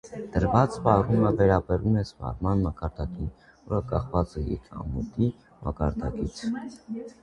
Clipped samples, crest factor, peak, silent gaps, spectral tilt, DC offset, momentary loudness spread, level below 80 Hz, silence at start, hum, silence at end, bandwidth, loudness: under 0.1%; 22 dB; -4 dBFS; none; -8.5 dB/octave; under 0.1%; 14 LU; -38 dBFS; 0.05 s; none; 0.1 s; 10.5 kHz; -27 LUFS